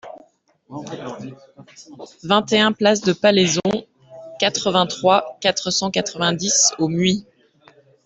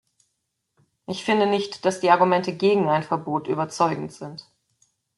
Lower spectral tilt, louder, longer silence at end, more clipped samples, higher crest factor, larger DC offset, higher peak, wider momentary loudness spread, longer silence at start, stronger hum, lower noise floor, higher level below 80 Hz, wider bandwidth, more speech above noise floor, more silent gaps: second, -3 dB/octave vs -5.5 dB/octave; first, -18 LUFS vs -22 LUFS; about the same, 0.85 s vs 0.75 s; neither; about the same, 18 dB vs 20 dB; neither; about the same, -2 dBFS vs -4 dBFS; about the same, 20 LU vs 18 LU; second, 0.05 s vs 1.1 s; neither; second, -54 dBFS vs -77 dBFS; first, -60 dBFS vs -70 dBFS; second, 8.2 kHz vs 11.5 kHz; second, 35 dB vs 55 dB; neither